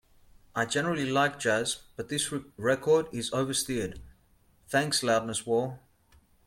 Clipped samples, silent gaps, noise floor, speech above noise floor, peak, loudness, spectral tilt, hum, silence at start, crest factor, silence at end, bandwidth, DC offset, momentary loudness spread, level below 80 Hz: under 0.1%; none; -64 dBFS; 35 dB; -12 dBFS; -29 LUFS; -3.5 dB/octave; none; 0.55 s; 18 dB; 0.7 s; 16.5 kHz; under 0.1%; 10 LU; -60 dBFS